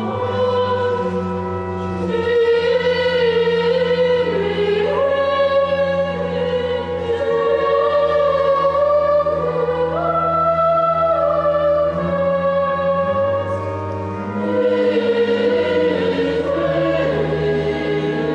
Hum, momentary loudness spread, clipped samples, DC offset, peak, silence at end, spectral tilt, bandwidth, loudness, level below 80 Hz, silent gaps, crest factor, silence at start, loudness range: none; 6 LU; under 0.1%; under 0.1%; -6 dBFS; 0 s; -7 dB/octave; 8.2 kHz; -18 LUFS; -40 dBFS; none; 12 dB; 0 s; 2 LU